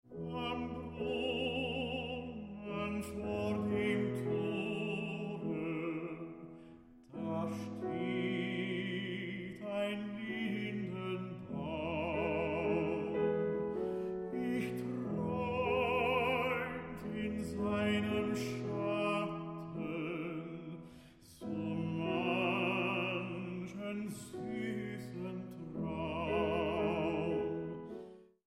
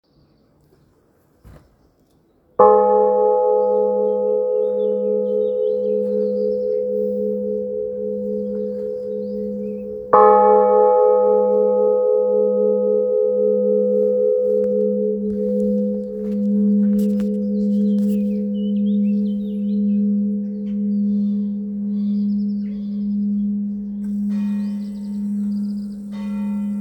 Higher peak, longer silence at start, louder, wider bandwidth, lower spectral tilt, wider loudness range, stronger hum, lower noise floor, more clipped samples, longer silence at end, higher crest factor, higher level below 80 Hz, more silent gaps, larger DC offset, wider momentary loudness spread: second, -22 dBFS vs 0 dBFS; second, 0.05 s vs 1.45 s; second, -37 LUFS vs -19 LUFS; first, 14.5 kHz vs 5 kHz; second, -6.5 dB/octave vs -10.5 dB/octave; second, 5 LU vs 8 LU; neither; about the same, -57 dBFS vs -58 dBFS; neither; first, 0.25 s vs 0 s; about the same, 16 dB vs 18 dB; about the same, -60 dBFS vs -56 dBFS; neither; neither; about the same, 10 LU vs 12 LU